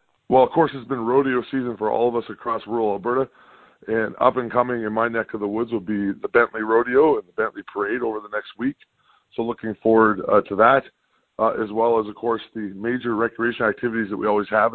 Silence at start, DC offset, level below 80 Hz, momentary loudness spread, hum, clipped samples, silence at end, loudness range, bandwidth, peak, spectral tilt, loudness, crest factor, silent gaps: 0.3 s; under 0.1%; -58 dBFS; 11 LU; none; under 0.1%; 0 s; 3 LU; 4.4 kHz; -2 dBFS; -10 dB/octave; -22 LUFS; 20 dB; none